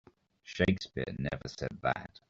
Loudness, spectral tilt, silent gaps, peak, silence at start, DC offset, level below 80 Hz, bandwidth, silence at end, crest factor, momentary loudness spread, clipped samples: -34 LUFS; -5 dB/octave; none; -12 dBFS; 0.45 s; under 0.1%; -54 dBFS; 7.6 kHz; 0.1 s; 22 dB; 9 LU; under 0.1%